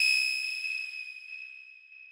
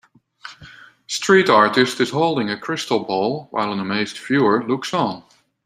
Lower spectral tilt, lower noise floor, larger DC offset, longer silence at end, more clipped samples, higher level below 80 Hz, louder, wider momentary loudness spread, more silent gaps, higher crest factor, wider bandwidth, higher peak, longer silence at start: second, 7 dB/octave vs -4.5 dB/octave; first, -52 dBFS vs -44 dBFS; neither; second, 0 s vs 0.45 s; neither; second, under -90 dBFS vs -64 dBFS; second, -30 LUFS vs -19 LUFS; first, 23 LU vs 12 LU; neither; about the same, 18 dB vs 20 dB; about the same, 16 kHz vs 15 kHz; second, -16 dBFS vs 0 dBFS; second, 0 s vs 0.45 s